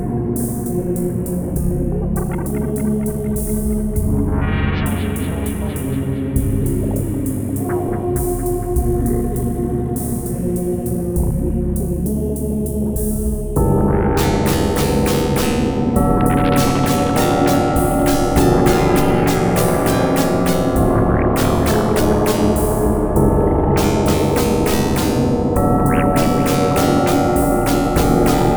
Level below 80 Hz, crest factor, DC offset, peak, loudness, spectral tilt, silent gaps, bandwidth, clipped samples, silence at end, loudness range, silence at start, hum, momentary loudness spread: -24 dBFS; 16 dB; under 0.1%; 0 dBFS; -17 LUFS; -6 dB/octave; none; over 20 kHz; under 0.1%; 0 s; 5 LU; 0 s; none; 6 LU